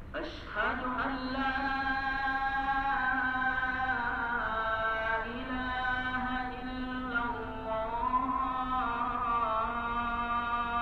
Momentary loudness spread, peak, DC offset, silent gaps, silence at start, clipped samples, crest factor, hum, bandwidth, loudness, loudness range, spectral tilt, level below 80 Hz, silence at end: 6 LU; -18 dBFS; under 0.1%; none; 0 s; under 0.1%; 14 dB; none; 7.8 kHz; -32 LUFS; 3 LU; -6.5 dB/octave; -46 dBFS; 0 s